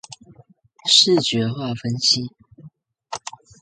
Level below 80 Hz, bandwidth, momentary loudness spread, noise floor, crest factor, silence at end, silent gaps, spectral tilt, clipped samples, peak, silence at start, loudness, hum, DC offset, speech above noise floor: -60 dBFS; 9.6 kHz; 21 LU; -52 dBFS; 22 dB; 0.45 s; none; -3.5 dB/octave; under 0.1%; 0 dBFS; 0.1 s; -17 LUFS; none; under 0.1%; 33 dB